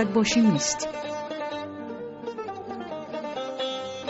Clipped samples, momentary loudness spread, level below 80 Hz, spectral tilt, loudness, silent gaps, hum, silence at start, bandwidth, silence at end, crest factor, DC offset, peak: under 0.1%; 15 LU; -60 dBFS; -4 dB/octave; -28 LUFS; none; none; 0 s; 8 kHz; 0 s; 16 dB; under 0.1%; -12 dBFS